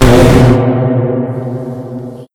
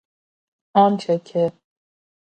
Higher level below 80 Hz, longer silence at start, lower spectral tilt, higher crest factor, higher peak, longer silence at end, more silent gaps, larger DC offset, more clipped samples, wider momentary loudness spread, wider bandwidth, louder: first, -22 dBFS vs -70 dBFS; second, 0 s vs 0.75 s; about the same, -7 dB/octave vs -7.5 dB/octave; second, 10 dB vs 20 dB; about the same, 0 dBFS vs -2 dBFS; second, 0.1 s vs 0.85 s; neither; neither; first, 2% vs under 0.1%; first, 17 LU vs 6 LU; first, 17 kHz vs 9 kHz; first, -10 LUFS vs -20 LUFS